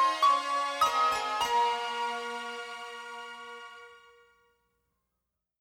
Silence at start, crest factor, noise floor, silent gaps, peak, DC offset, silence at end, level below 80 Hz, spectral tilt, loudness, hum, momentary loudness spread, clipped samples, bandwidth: 0 s; 18 dB; -85 dBFS; none; -14 dBFS; under 0.1%; 1.6 s; -70 dBFS; -0.5 dB/octave; -29 LUFS; 60 Hz at -80 dBFS; 19 LU; under 0.1%; 17 kHz